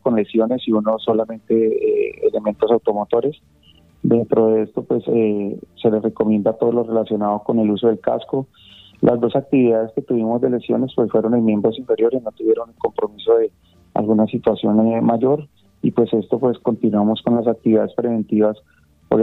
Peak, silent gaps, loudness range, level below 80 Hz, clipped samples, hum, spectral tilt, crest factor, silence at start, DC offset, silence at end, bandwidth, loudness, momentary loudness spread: 0 dBFS; none; 1 LU; -56 dBFS; under 0.1%; none; -10 dB/octave; 18 dB; 0.05 s; under 0.1%; 0 s; 4.1 kHz; -19 LUFS; 6 LU